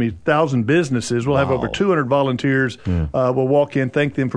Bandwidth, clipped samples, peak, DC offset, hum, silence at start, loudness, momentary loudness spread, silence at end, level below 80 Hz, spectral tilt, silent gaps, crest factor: 10.5 kHz; under 0.1%; -4 dBFS; under 0.1%; none; 0 s; -18 LUFS; 4 LU; 0 s; -40 dBFS; -6.5 dB/octave; none; 14 dB